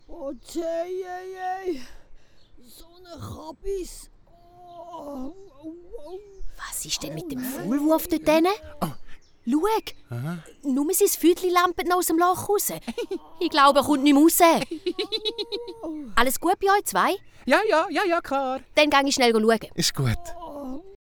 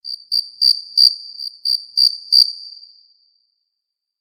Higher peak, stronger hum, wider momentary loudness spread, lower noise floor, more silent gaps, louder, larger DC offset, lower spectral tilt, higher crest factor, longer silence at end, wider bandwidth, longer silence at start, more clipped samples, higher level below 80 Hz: second, -4 dBFS vs 0 dBFS; neither; first, 19 LU vs 16 LU; second, -51 dBFS vs -80 dBFS; neither; second, -23 LUFS vs -14 LUFS; neither; first, -3.5 dB/octave vs 6 dB/octave; about the same, 20 dB vs 20 dB; second, 0.1 s vs 1.5 s; first, over 20 kHz vs 14.5 kHz; about the same, 0.1 s vs 0.05 s; neither; first, -46 dBFS vs -84 dBFS